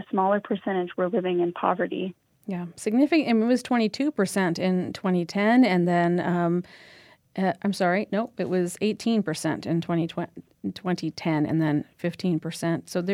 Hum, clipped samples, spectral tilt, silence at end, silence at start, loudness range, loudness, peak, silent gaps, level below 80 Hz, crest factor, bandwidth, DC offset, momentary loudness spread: none; under 0.1%; -6.5 dB/octave; 0 s; 0 s; 5 LU; -25 LUFS; -6 dBFS; none; -70 dBFS; 18 dB; 15 kHz; under 0.1%; 11 LU